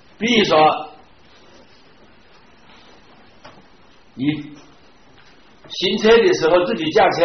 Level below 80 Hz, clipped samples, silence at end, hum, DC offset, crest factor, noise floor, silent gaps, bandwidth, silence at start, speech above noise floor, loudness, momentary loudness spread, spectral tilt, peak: -52 dBFS; under 0.1%; 0 s; none; 0.3%; 16 dB; -51 dBFS; none; 6.4 kHz; 0.2 s; 35 dB; -16 LUFS; 17 LU; -2.5 dB/octave; -4 dBFS